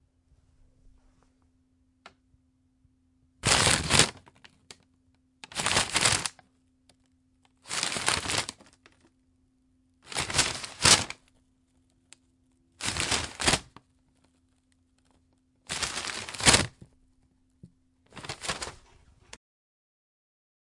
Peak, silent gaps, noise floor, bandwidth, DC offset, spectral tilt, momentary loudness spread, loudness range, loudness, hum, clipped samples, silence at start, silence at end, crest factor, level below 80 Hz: -2 dBFS; none; -69 dBFS; 11.5 kHz; under 0.1%; -1.5 dB/octave; 16 LU; 6 LU; -25 LUFS; none; under 0.1%; 2.05 s; 2 s; 30 dB; -52 dBFS